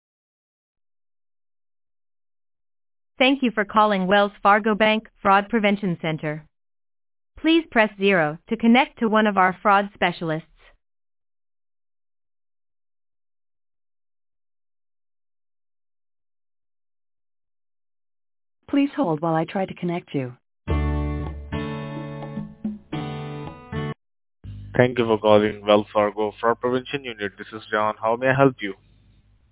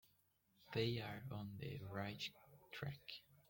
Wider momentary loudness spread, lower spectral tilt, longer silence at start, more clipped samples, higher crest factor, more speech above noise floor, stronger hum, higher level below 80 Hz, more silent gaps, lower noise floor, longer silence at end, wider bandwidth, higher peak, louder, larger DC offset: first, 15 LU vs 12 LU; first, -10 dB/octave vs -6 dB/octave; first, 3.2 s vs 0.6 s; neither; about the same, 24 dB vs 22 dB; first, 36 dB vs 32 dB; neither; first, -42 dBFS vs -74 dBFS; neither; second, -57 dBFS vs -79 dBFS; first, 0.8 s vs 0.1 s; second, 4 kHz vs 17 kHz; first, 0 dBFS vs -26 dBFS; first, -21 LUFS vs -48 LUFS; neither